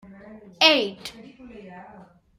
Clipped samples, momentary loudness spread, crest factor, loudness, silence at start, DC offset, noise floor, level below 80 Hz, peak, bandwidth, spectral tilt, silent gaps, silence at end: under 0.1%; 26 LU; 24 dB; -19 LUFS; 0.3 s; under 0.1%; -50 dBFS; -64 dBFS; -2 dBFS; 16 kHz; -2 dB/octave; none; 0.55 s